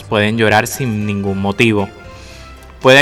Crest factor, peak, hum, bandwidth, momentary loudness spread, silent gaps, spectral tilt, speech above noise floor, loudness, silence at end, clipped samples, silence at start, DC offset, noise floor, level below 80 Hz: 14 dB; 0 dBFS; none; 16 kHz; 23 LU; none; -5 dB/octave; 21 dB; -14 LUFS; 0 s; under 0.1%; 0 s; under 0.1%; -35 dBFS; -42 dBFS